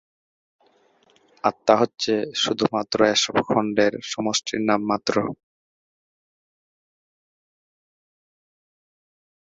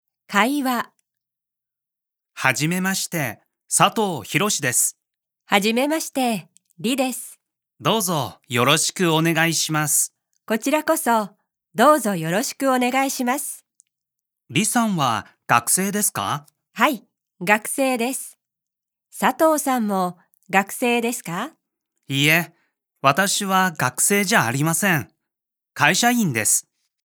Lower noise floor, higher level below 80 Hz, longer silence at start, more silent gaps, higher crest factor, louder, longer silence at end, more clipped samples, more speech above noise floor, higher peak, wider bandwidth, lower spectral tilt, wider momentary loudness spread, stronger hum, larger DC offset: second, -61 dBFS vs -87 dBFS; first, -64 dBFS vs -72 dBFS; first, 1.45 s vs 0.3 s; neither; about the same, 24 dB vs 22 dB; about the same, -22 LUFS vs -20 LUFS; first, 4.2 s vs 0.45 s; neither; second, 39 dB vs 67 dB; about the same, -2 dBFS vs 0 dBFS; second, 8 kHz vs over 20 kHz; about the same, -3.5 dB/octave vs -3 dB/octave; second, 7 LU vs 11 LU; neither; neither